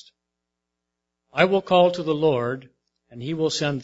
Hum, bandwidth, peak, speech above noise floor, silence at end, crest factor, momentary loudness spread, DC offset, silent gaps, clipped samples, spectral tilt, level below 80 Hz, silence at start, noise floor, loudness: none; 8 kHz; -2 dBFS; 61 dB; 0 s; 22 dB; 13 LU; under 0.1%; none; under 0.1%; -5.5 dB/octave; -62 dBFS; 1.35 s; -82 dBFS; -22 LUFS